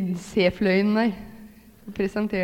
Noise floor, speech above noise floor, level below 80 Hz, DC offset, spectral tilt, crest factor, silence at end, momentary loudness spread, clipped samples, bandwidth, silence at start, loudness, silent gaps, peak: -47 dBFS; 24 dB; -50 dBFS; under 0.1%; -6.5 dB/octave; 18 dB; 0 s; 17 LU; under 0.1%; 16 kHz; 0 s; -23 LUFS; none; -8 dBFS